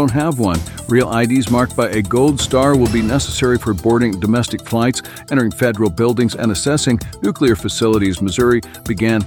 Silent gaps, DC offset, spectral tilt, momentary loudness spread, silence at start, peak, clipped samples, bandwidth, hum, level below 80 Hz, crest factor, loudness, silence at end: none; under 0.1%; -5.5 dB/octave; 4 LU; 0 s; 0 dBFS; under 0.1%; 19 kHz; none; -36 dBFS; 14 dB; -16 LUFS; 0 s